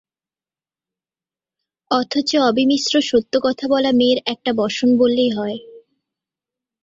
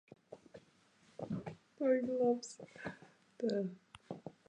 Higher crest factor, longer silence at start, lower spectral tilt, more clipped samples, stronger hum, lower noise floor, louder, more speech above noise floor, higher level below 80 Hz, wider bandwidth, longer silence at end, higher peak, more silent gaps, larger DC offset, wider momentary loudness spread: about the same, 16 dB vs 20 dB; first, 1.9 s vs 0.3 s; second, -4 dB/octave vs -6 dB/octave; neither; neither; first, under -90 dBFS vs -69 dBFS; first, -17 LUFS vs -38 LUFS; first, over 73 dB vs 33 dB; first, -60 dBFS vs -78 dBFS; second, 7.8 kHz vs 10 kHz; first, 1.05 s vs 0.15 s; first, -2 dBFS vs -20 dBFS; neither; neither; second, 6 LU vs 24 LU